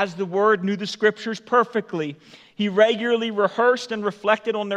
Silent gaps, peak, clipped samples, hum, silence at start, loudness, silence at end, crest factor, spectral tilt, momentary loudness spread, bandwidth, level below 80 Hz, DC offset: none; -4 dBFS; under 0.1%; none; 0 s; -22 LUFS; 0 s; 18 dB; -5 dB/octave; 9 LU; 9.4 kHz; -76 dBFS; under 0.1%